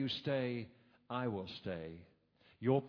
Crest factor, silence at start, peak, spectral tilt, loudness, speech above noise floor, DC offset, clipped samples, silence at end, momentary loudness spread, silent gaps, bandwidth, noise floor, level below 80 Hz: 20 dB; 0 s; -20 dBFS; -5 dB/octave; -41 LUFS; 32 dB; under 0.1%; under 0.1%; 0 s; 14 LU; none; 5.4 kHz; -70 dBFS; -72 dBFS